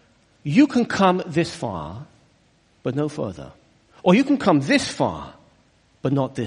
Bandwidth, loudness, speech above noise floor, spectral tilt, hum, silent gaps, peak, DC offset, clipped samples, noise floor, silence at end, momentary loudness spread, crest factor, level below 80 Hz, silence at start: 10.5 kHz; -21 LUFS; 39 dB; -6 dB/octave; none; none; -2 dBFS; under 0.1%; under 0.1%; -60 dBFS; 0 s; 17 LU; 20 dB; -54 dBFS; 0.45 s